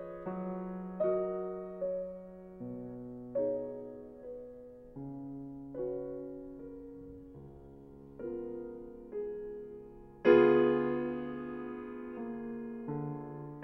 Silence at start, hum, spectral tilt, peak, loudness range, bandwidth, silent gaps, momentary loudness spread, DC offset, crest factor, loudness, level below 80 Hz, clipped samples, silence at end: 0 s; none; -9.5 dB/octave; -10 dBFS; 13 LU; 5.8 kHz; none; 19 LU; under 0.1%; 26 dB; -35 LUFS; -62 dBFS; under 0.1%; 0 s